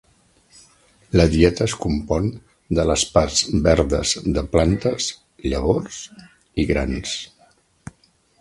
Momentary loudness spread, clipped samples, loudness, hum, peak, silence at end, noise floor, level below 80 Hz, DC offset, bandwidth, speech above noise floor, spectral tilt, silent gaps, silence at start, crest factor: 12 LU; under 0.1%; -20 LUFS; none; 0 dBFS; 1.15 s; -59 dBFS; -32 dBFS; under 0.1%; 11.5 kHz; 40 dB; -5 dB/octave; none; 1.15 s; 20 dB